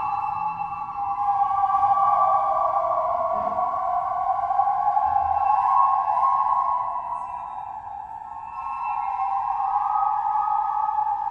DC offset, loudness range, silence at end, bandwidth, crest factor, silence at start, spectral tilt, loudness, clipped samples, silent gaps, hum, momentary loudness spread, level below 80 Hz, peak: under 0.1%; 5 LU; 0 s; 6 kHz; 16 dB; 0 s; -6 dB/octave; -23 LUFS; under 0.1%; none; none; 13 LU; -56 dBFS; -8 dBFS